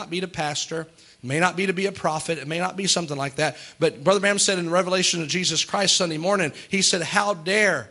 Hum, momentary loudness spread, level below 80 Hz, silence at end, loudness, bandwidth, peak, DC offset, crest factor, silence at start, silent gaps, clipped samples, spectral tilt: none; 8 LU; -64 dBFS; 0.05 s; -22 LUFS; 12 kHz; -4 dBFS; under 0.1%; 20 dB; 0 s; none; under 0.1%; -2.5 dB/octave